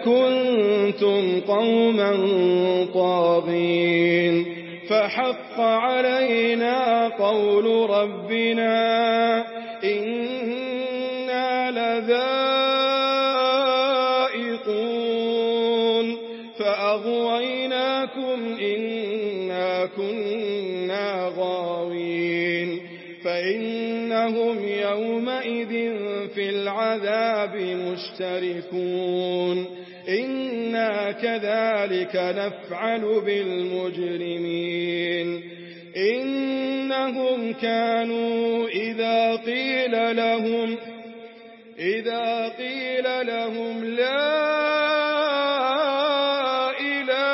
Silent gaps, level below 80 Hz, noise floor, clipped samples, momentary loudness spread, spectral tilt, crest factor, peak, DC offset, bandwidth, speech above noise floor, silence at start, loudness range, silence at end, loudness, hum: none; -76 dBFS; -45 dBFS; under 0.1%; 8 LU; -9 dB/octave; 14 dB; -8 dBFS; under 0.1%; 5.8 kHz; 23 dB; 0 s; 5 LU; 0 s; -23 LUFS; none